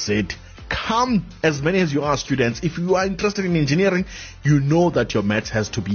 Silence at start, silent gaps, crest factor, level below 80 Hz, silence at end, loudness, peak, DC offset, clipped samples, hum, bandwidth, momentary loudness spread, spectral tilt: 0 s; none; 14 dB; -40 dBFS; 0 s; -20 LUFS; -6 dBFS; under 0.1%; under 0.1%; none; 6.8 kHz; 7 LU; -6 dB/octave